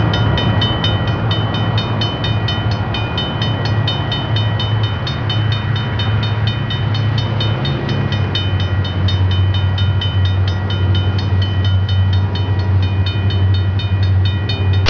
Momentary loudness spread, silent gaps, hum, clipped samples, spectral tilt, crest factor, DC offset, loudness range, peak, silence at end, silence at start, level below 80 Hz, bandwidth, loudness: 3 LU; none; none; under 0.1%; -7 dB/octave; 10 dB; 0.4%; 2 LU; -4 dBFS; 0 s; 0 s; -32 dBFS; 5.4 kHz; -16 LUFS